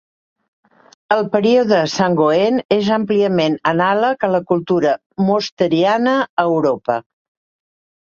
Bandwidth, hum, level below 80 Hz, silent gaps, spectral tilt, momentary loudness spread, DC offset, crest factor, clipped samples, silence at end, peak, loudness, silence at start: 7.4 kHz; none; -60 dBFS; 2.65-2.69 s, 5.06-5.10 s, 5.52-5.57 s, 6.29-6.37 s; -6 dB/octave; 5 LU; under 0.1%; 16 dB; under 0.1%; 1.1 s; 0 dBFS; -16 LUFS; 1.1 s